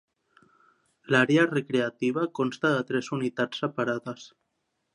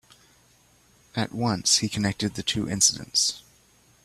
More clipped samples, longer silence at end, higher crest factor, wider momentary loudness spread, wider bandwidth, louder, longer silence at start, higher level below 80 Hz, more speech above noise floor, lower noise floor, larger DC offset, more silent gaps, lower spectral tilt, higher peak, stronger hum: neither; about the same, 0.65 s vs 0.65 s; about the same, 22 dB vs 22 dB; about the same, 9 LU vs 10 LU; second, 10.5 kHz vs 14.5 kHz; about the same, -26 LUFS vs -24 LUFS; about the same, 1.1 s vs 1.15 s; second, -76 dBFS vs -56 dBFS; first, 52 dB vs 35 dB; first, -78 dBFS vs -60 dBFS; neither; neither; first, -6 dB/octave vs -2.5 dB/octave; about the same, -6 dBFS vs -6 dBFS; neither